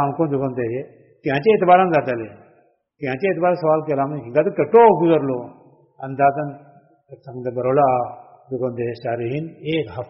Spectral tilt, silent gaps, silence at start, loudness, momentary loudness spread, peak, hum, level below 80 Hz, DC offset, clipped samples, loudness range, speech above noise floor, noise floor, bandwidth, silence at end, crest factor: -6 dB/octave; none; 0 s; -19 LUFS; 17 LU; 0 dBFS; none; -60 dBFS; under 0.1%; under 0.1%; 5 LU; 39 dB; -58 dBFS; 5.8 kHz; 0.05 s; 18 dB